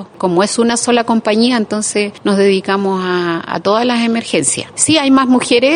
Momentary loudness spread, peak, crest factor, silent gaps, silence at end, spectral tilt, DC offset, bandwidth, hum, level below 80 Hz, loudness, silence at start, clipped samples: 6 LU; 0 dBFS; 12 dB; none; 0 s; -3.5 dB/octave; under 0.1%; 11 kHz; none; -56 dBFS; -13 LUFS; 0 s; under 0.1%